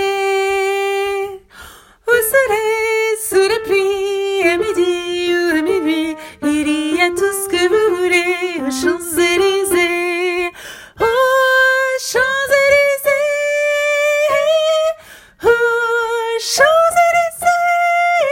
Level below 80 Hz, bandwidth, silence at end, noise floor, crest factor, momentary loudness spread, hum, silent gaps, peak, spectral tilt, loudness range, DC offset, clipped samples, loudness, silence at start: -50 dBFS; 16.5 kHz; 0 s; -40 dBFS; 16 dB; 7 LU; none; none; 0 dBFS; -2 dB/octave; 3 LU; under 0.1%; under 0.1%; -15 LUFS; 0 s